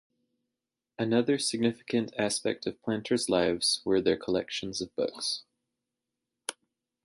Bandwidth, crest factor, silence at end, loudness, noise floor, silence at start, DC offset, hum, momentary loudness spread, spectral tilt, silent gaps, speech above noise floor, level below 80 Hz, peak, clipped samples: 12 kHz; 20 dB; 0.55 s; -29 LUFS; -88 dBFS; 1 s; under 0.1%; none; 9 LU; -3.5 dB/octave; none; 59 dB; -64 dBFS; -12 dBFS; under 0.1%